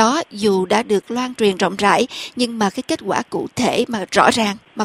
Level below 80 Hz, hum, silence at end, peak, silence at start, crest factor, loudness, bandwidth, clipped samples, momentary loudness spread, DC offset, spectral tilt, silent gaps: -56 dBFS; none; 0 s; 0 dBFS; 0 s; 18 dB; -18 LUFS; 15.5 kHz; under 0.1%; 7 LU; under 0.1%; -4 dB/octave; none